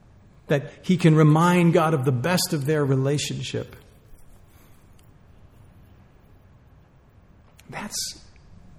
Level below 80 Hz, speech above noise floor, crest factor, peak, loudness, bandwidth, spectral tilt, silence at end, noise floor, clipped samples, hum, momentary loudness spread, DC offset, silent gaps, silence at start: -54 dBFS; 33 dB; 20 dB; -4 dBFS; -22 LUFS; 15.5 kHz; -6 dB/octave; 0.65 s; -53 dBFS; under 0.1%; none; 16 LU; under 0.1%; none; 0.5 s